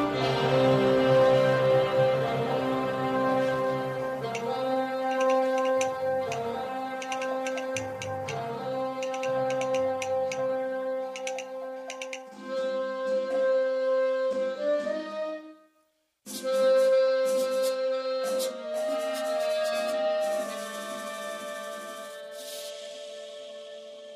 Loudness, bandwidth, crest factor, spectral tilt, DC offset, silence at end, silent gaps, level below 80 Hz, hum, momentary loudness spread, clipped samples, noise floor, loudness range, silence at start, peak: -28 LUFS; 15 kHz; 16 dB; -5 dB/octave; under 0.1%; 0 s; none; -64 dBFS; none; 15 LU; under 0.1%; -71 dBFS; 7 LU; 0 s; -12 dBFS